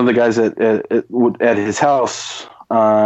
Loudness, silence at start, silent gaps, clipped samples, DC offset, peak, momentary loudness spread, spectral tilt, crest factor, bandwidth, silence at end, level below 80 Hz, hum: -16 LUFS; 0 s; none; under 0.1%; under 0.1%; -2 dBFS; 9 LU; -5 dB/octave; 14 dB; 8.4 kHz; 0 s; -64 dBFS; none